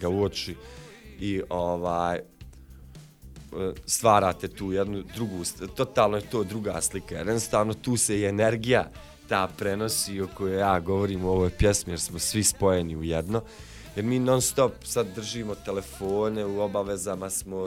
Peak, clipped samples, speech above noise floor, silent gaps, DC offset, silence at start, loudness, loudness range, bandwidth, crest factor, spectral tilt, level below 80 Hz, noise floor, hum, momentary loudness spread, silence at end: -6 dBFS; under 0.1%; 21 dB; none; under 0.1%; 0 s; -27 LUFS; 3 LU; 17 kHz; 22 dB; -4.5 dB/octave; -44 dBFS; -48 dBFS; none; 10 LU; 0 s